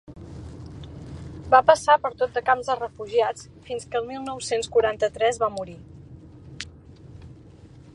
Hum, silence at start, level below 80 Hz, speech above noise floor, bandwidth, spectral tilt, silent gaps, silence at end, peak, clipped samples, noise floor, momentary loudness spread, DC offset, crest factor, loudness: none; 0.1 s; -50 dBFS; 24 dB; 11.5 kHz; -3.5 dB/octave; none; 0.3 s; -2 dBFS; under 0.1%; -47 dBFS; 22 LU; under 0.1%; 24 dB; -23 LUFS